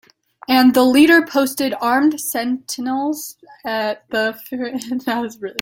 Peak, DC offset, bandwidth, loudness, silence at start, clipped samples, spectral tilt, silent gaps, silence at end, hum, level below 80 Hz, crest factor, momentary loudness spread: 0 dBFS; under 0.1%; 17 kHz; -17 LUFS; 0.5 s; under 0.1%; -3 dB/octave; none; 0 s; none; -60 dBFS; 16 dB; 14 LU